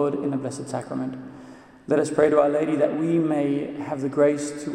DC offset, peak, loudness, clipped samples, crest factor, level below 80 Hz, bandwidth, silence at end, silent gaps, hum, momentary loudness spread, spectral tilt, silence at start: under 0.1%; -4 dBFS; -23 LUFS; under 0.1%; 18 dB; -64 dBFS; 11 kHz; 0 s; none; none; 13 LU; -6.5 dB/octave; 0 s